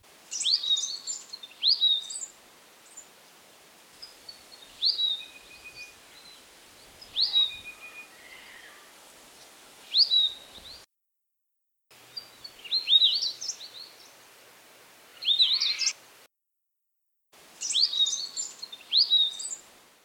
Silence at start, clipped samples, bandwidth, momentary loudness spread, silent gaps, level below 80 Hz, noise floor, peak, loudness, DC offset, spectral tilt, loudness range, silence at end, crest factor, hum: 0.3 s; under 0.1%; 19.5 kHz; 25 LU; none; -74 dBFS; -82 dBFS; -10 dBFS; -24 LUFS; under 0.1%; 3 dB/octave; 6 LU; 0.45 s; 22 dB; none